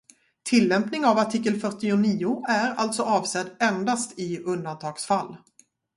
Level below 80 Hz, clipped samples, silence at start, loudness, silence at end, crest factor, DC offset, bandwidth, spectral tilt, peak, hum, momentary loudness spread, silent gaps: -68 dBFS; under 0.1%; 0.45 s; -24 LUFS; 0.6 s; 18 dB; under 0.1%; 11.5 kHz; -4.5 dB/octave; -8 dBFS; none; 9 LU; none